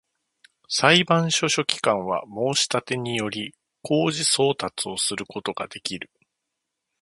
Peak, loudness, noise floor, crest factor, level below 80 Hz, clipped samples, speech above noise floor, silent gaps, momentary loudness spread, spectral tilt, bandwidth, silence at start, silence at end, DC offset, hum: 0 dBFS; -23 LUFS; -81 dBFS; 24 dB; -64 dBFS; under 0.1%; 58 dB; none; 14 LU; -3 dB/octave; 11.5 kHz; 0.7 s; 0.95 s; under 0.1%; none